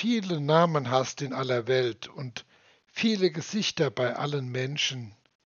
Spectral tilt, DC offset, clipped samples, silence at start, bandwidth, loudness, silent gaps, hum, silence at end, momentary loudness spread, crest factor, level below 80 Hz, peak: -4 dB/octave; under 0.1%; under 0.1%; 0 s; 7.2 kHz; -27 LUFS; none; none; 0.3 s; 15 LU; 22 dB; -76 dBFS; -6 dBFS